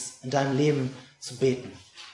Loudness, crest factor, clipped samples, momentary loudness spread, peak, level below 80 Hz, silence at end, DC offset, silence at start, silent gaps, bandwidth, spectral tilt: -27 LUFS; 18 dB; under 0.1%; 17 LU; -10 dBFS; -70 dBFS; 0 s; under 0.1%; 0 s; none; 11.5 kHz; -5.5 dB/octave